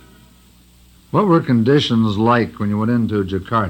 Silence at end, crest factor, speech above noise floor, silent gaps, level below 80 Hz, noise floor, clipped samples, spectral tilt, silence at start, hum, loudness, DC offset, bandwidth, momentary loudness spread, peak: 0 s; 16 dB; 33 dB; none; -48 dBFS; -49 dBFS; under 0.1%; -7.5 dB/octave; 1.15 s; 60 Hz at -40 dBFS; -17 LUFS; under 0.1%; 16 kHz; 6 LU; -2 dBFS